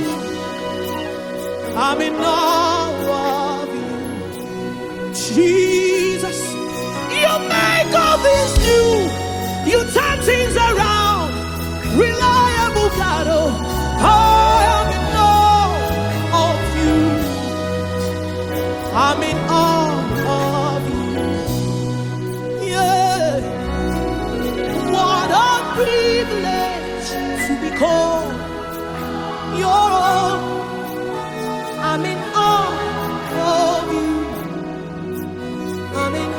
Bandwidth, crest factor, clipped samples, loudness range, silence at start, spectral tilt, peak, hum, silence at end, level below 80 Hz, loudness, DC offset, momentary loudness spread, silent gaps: 19.5 kHz; 16 dB; under 0.1%; 5 LU; 0 s; -4.5 dB/octave; -2 dBFS; none; 0 s; -32 dBFS; -18 LUFS; under 0.1%; 11 LU; none